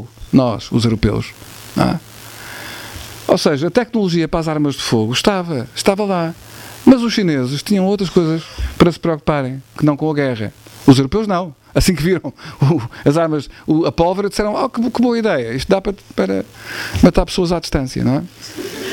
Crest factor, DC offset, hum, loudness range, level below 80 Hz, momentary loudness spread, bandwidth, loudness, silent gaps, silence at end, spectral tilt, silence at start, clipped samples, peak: 16 dB; under 0.1%; none; 3 LU; -34 dBFS; 14 LU; 17.5 kHz; -16 LUFS; none; 0 s; -6 dB/octave; 0 s; 0.1%; 0 dBFS